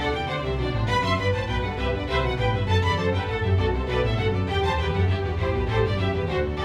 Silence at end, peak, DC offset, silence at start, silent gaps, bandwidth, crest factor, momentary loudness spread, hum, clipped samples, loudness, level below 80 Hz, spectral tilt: 0 s; -10 dBFS; under 0.1%; 0 s; none; 9.4 kHz; 14 dB; 4 LU; none; under 0.1%; -24 LUFS; -32 dBFS; -6.5 dB/octave